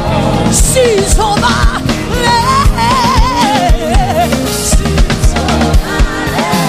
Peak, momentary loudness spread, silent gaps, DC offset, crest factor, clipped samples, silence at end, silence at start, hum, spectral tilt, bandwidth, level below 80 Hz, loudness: 0 dBFS; 4 LU; none; under 0.1%; 10 dB; under 0.1%; 0 s; 0 s; none; -4.5 dB/octave; 16 kHz; -14 dBFS; -11 LUFS